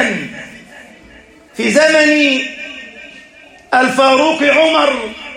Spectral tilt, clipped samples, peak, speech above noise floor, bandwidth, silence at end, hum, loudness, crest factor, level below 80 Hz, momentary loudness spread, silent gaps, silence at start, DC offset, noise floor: -3 dB/octave; under 0.1%; 0 dBFS; 30 dB; 15 kHz; 0 s; none; -12 LUFS; 14 dB; -54 dBFS; 22 LU; none; 0 s; under 0.1%; -41 dBFS